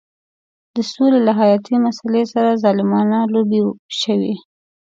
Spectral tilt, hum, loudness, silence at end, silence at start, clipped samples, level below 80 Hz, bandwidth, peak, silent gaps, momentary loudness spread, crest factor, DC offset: -6.5 dB/octave; none; -16 LUFS; 0.55 s; 0.75 s; under 0.1%; -66 dBFS; 7.8 kHz; -2 dBFS; 3.79-3.89 s; 10 LU; 14 dB; under 0.1%